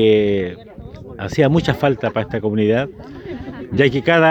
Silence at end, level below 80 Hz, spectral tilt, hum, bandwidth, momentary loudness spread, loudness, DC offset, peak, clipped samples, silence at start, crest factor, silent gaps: 0 s; -44 dBFS; -7 dB/octave; none; 8.4 kHz; 20 LU; -18 LUFS; under 0.1%; 0 dBFS; under 0.1%; 0 s; 16 dB; none